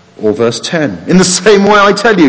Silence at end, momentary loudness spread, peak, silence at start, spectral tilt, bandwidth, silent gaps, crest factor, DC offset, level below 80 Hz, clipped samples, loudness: 0 s; 8 LU; 0 dBFS; 0.2 s; -4.5 dB/octave; 8 kHz; none; 8 dB; under 0.1%; -42 dBFS; 0.6%; -8 LUFS